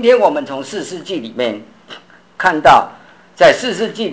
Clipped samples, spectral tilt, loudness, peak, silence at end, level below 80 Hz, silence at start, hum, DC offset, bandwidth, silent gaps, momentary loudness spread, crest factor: under 0.1%; -4 dB/octave; -14 LUFS; 0 dBFS; 0 s; -48 dBFS; 0 s; none; 0.2%; 8 kHz; none; 15 LU; 14 dB